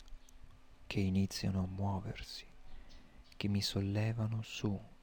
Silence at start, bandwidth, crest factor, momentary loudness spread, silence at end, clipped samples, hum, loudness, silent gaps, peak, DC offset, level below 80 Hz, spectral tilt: 0 s; 18 kHz; 16 dB; 11 LU; 0.05 s; under 0.1%; none; -38 LUFS; none; -22 dBFS; under 0.1%; -56 dBFS; -6 dB/octave